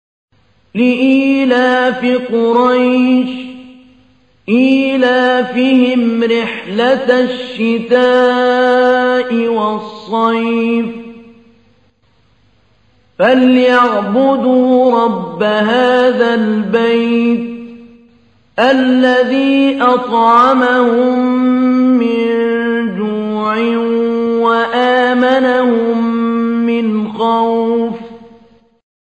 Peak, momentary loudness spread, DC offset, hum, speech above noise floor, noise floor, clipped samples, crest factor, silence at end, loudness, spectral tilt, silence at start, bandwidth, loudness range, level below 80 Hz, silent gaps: 0 dBFS; 7 LU; 0.2%; none; 43 dB; -54 dBFS; under 0.1%; 12 dB; 0.85 s; -12 LUFS; -6 dB/octave; 0.75 s; 8.2 kHz; 4 LU; -60 dBFS; none